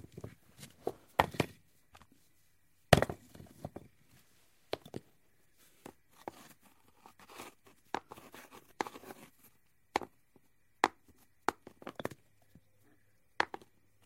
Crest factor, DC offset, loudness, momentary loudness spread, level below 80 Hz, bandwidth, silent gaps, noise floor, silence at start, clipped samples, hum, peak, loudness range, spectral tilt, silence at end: 38 dB; under 0.1%; -36 LUFS; 24 LU; -60 dBFS; 16 kHz; none; -74 dBFS; 0.15 s; under 0.1%; none; -2 dBFS; 16 LU; -4.5 dB/octave; 0.6 s